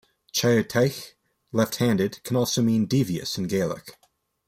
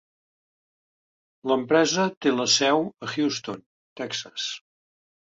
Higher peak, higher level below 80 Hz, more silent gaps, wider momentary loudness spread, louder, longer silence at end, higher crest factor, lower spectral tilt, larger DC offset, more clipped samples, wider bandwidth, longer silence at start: about the same, -8 dBFS vs -6 dBFS; first, -60 dBFS vs -72 dBFS; second, none vs 2.17-2.21 s, 3.66-3.96 s; second, 8 LU vs 16 LU; about the same, -24 LUFS vs -24 LUFS; about the same, 0.55 s vs 0.65 s; about the same, 18 dB vs 20 dB; first, -5 dB/octave vs -3 dB/octave; neither; neither; first, 16 kHz vs 8 kHz; second, 0.35 s vs 1.45 s